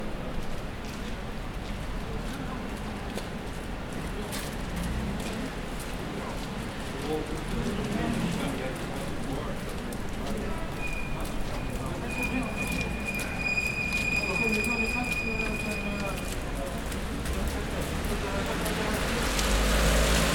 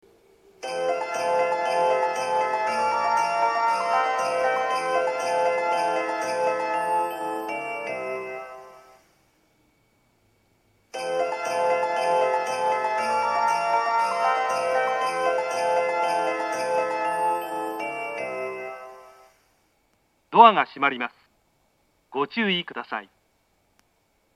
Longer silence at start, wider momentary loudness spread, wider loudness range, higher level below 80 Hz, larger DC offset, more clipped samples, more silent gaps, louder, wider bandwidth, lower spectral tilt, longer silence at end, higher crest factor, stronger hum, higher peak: second, 0 s vs 0.6 s; about the same, 10 LU vs 10 LU; about the same, 8 LU vs 8 LU; first, -36 dBFS vs -72 dBFS; neither; neither; neither; second, -31 LUFS vs -24 LUFS; first, 19 kHz vs 14.5 kHz; first, -4.5 dB/octave vs -3 dB/octave; second, 0 s vs 1.3 s; about the same, 22 dB vs 24 dB; neither; second, -8 dBFS vs 0 dBFS